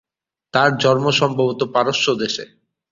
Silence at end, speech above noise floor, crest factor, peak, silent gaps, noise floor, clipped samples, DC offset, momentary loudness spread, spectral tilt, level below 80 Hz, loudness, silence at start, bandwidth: 0.45 s; 33 dB; 18 dB; -2 dBFS; none; -51 dBFS; under 0.1%; under 0.1%; 7 LU; -4.5 dB/octave; -58 dBFS; -18 LUFS; 0.55 s; 7.6 kHz